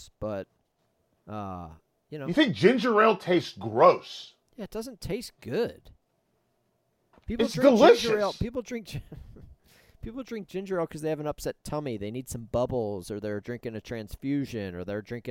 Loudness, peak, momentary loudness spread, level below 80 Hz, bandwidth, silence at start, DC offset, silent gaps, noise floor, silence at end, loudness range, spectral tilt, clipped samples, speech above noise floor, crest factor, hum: -27 LUFS; -6 dBFS; 20 LU; -52 dBFS; 16.5 kHz; 0 s; under 0.1%; none; -73 dBFS; 0 s; 10 LU; -5.5 dB/octave; under 0.1%; 46 dB; 22 dB; none